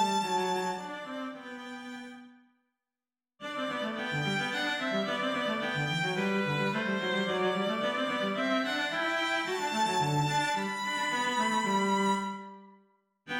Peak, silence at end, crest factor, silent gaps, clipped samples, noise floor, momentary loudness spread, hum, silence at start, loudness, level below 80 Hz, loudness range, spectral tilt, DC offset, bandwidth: -16 dBFS; 0 s; 16 dB; none; under 0.1%; under -90 dBFS; 12 LU; none; 0 s; -30 LUFS; -72 dBFS; 8 LU; -4 dB/octave; under 0.1%; 17 kHz